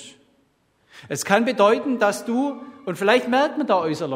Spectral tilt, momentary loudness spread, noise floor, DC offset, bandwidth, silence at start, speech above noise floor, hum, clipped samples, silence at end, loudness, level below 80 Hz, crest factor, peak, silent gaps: -4.5 dB/octave; 11 LU; -64 dBFS; under 0.1%; 16 kHz; 0 s; 43 dB; none; under 0.1%; 0 s; -20 LUFS; -70 dBFS; 22 dB; 0 dBFS; none